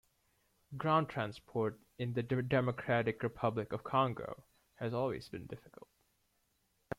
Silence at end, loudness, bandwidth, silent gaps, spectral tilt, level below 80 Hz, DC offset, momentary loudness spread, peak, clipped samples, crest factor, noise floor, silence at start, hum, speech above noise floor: 0.05 s; -36 LUFS; 14.5 kHz; none; -8 dB/octave; -68 dBFS; under 0.1%; 15 LU; -18 dBFS; under 0.1%; 20 dB; -78 dBFS; 0.7 s; none; 42 dB